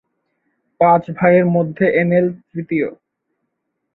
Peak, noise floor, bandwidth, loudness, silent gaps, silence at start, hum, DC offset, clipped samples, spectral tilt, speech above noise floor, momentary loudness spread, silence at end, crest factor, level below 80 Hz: -2 dBFS; -73 dBFS; 4.1 kHz; -16 LUFS; none; 0.8 s; none; under 0.1%; under 0.1%; -11 dB/octave; 58 dB; 9 LU; 1 s; 16 dB; -60 dBFS